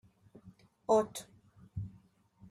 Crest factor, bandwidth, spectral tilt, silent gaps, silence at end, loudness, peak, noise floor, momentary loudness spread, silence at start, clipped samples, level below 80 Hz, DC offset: 22 dB; 14 kHz; -5.5 dB/octave; none; 0.6 s; -34 LUFS; -16 dBFS; -64 dBFS; 17 LU; 0.45 s; under 0.1%; -66 dBFS; under 0.1%